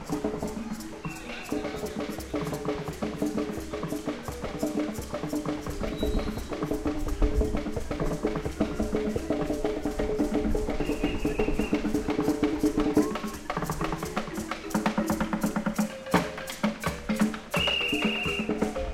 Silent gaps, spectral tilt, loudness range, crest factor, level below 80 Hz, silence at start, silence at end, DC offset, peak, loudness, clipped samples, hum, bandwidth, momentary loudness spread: none; -5 dB/octave; 5 LU; 20 dB; -38 dBFS; 0 s; 0 s; under 0.1%; -10 dBFS; -30 LUFS; under 0.1%; none; 16.5 kHz; 8 LU